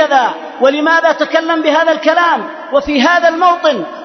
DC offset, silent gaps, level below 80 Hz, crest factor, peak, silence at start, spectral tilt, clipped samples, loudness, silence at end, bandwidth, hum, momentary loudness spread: under 0.1%; none; -48 dBFS; 12 dB; 0 dBFS; 0 s; -3 dB/octave; under 0.1%; -12 LUFS; 0 s; 6.4 kHz; none; 6 LU